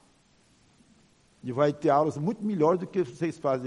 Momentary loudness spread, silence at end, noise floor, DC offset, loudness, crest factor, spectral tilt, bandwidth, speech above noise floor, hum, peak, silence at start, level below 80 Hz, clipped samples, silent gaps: 7 LU; 0 s; -63 dBFS; under 0.1%; -27 LUFS; 18 dB; -7.5 dB/octave; 11 kHz; 37 dB; none; -10 dBFS; 1.45 s; -70 dBFS; under 0.1%; none